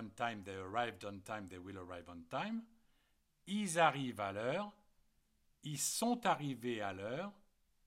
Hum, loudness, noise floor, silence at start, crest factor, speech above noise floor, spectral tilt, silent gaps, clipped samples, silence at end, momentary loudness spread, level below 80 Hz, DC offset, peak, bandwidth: none; -40 LUFS; -77 dBFS; 0 s; 22 dB; 37 dB; -4 dB/octave; none; under 0.1%; 0.55 s; 16 LU; -76 dBFS; under 0.1%; -18 dBFS; 16.5 kHz